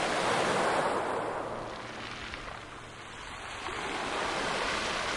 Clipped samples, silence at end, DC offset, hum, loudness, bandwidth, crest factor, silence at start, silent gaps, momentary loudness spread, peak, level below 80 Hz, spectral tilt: under 0.1%; 0 s; under 0.1%; none; -32 LUFS; 11.5 kHz; 18 dB; 0 s; none; 14 LU; -16 dBFS; -54 dBFS; -3 dB/octave